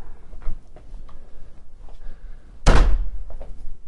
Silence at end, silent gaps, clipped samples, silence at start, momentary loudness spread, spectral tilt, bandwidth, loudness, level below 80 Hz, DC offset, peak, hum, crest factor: 0 s; none; under 0.1%; 0 s; 26 LU; -5.5 dB/octave; 10.5 kHz; -23 LUFS; -24 dBFS; under 0.1%; -2 dBFS; none; 18 dB